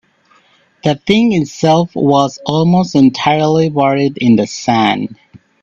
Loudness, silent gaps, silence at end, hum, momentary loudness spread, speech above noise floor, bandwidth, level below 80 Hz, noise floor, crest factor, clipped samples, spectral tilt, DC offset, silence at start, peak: -13 LUFS; none; 0.5 s; none; 5 LU; 40 dB; 7.8 kHz; -50 dBFS; -52 dBFS; 12 dB; under 0.1%; -6 dB/octave; under 0.1%; 0.85 s; 0 dBFS